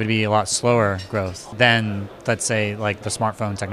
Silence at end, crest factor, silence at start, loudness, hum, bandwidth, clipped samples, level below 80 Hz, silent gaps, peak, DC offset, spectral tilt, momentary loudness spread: 0 s; 20 dB; 0 s; -21 LUFS; none; 13.5 kHz; under 0.1%; -54 dBFS; none; -2 dBFS; under 0.1%; -4 dB/octave; 10 LU